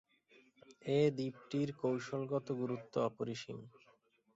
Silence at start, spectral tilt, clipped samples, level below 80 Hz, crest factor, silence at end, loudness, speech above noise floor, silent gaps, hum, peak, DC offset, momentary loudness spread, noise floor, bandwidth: 0.7 s; -6.5 dB/octave; under 0.1%; -78 dBFS; 18 dB; 0.65 s; -38 LUFS; 34 dB; none; none; -20 dBFS; under 0.1%; 13 LU; -72 dBFS; 7.6 kHz